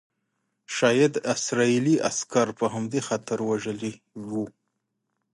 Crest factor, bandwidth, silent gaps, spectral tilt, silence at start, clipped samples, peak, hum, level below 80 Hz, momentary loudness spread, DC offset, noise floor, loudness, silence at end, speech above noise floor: 18 dB; 11.5 kHz; none; -4.5 dB/octave; 0.7 s; under 0.1%; -8 dBFS; none; -70 dBFS; 12 LU; under 0.1%; -79 dBFS; -25 LUFS; 0.85 s; 54 dB